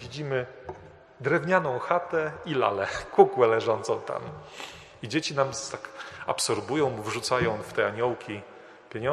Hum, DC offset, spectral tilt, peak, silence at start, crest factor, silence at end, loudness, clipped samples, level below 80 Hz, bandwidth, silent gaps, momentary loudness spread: none; under 0.1%; -4.5 dB/octave; -2 dBFS; 0 s; 26 dB; 0 s; -27 LUFS; under 0.1%; -60 dBFS; 13 kHz; none; 18 LU